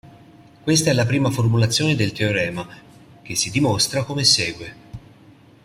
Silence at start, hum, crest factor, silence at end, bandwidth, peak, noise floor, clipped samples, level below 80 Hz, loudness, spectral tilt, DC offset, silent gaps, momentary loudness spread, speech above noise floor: 0.05 s; none; 18 dB; 0.65 s; 16 kHz; -2 dBFS; -49 dBFS; under 0.1%; -52 dBFS; -19 LUFS; -4 dB/octave; under 0.1%; none; 16 LU; 29 dB